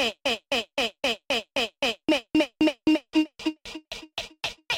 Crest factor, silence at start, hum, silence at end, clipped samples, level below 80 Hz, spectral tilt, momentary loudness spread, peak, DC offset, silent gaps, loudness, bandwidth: 16 dB; 0 s; none; 0 s; under 0.1%; -58 dBFS; -3 dB/octave; 12 LU; -12 dBFS; under 0.1%; none; -26 LUFS; 16 kHz